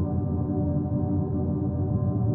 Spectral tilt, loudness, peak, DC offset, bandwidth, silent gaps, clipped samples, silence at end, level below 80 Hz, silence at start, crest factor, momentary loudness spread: -15 dB/octave; -27 LUFS; -14 dBFS; under 0.1%; 1.8 kHz; none; under 0.1%; 0 s; -40 dBFS; 0 s; 12 dB; 1 LU